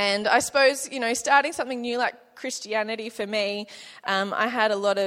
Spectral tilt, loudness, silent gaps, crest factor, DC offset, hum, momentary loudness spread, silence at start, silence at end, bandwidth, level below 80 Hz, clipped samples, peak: -2 dB/octave; -24 LUFS; none; 20 dB; under 0.1%; none; 12 LU; 0 s; 0 s; 16.5 kHz; -70 dBFS; under 0.1%; -4 dBFS